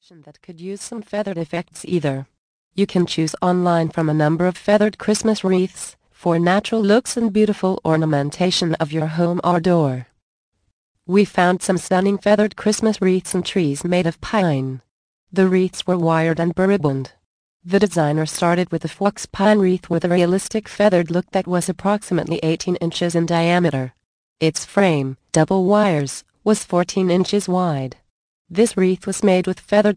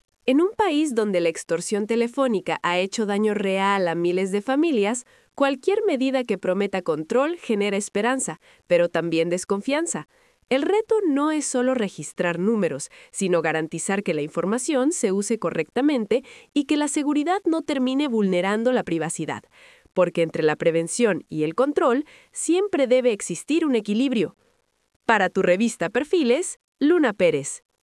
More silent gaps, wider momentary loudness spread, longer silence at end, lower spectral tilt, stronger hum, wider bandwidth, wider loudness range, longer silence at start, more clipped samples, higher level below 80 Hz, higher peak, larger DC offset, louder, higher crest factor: first, 2.38-2.71 s, 10.22-10.52 s, 10.73-10.95 s, 14.91-15.27 s, 17.25-17.60 s, 24.05-24.36 s, 28.10-28.45 s vs 24.96-25.00 s, 26.64-26.72 s; first, 9 LU vs 6 LU; second, 0 s vs 0.25 s; about the same, -5.5 dB/octave vs -4.5 dB/octave; neither; second, 10.5 kHz vs 12 kHz; about the same, 2 LU vs 2 LU; about the same, 0.25 s vs 0.25 s; neither; first, -54 dBFS vs -68 dBFS; about the same, -2 dBFS vs -2 dBFS; neither; first, -19 LUFS vs -23 LUFS; about the same, 16 dB vs 20 dB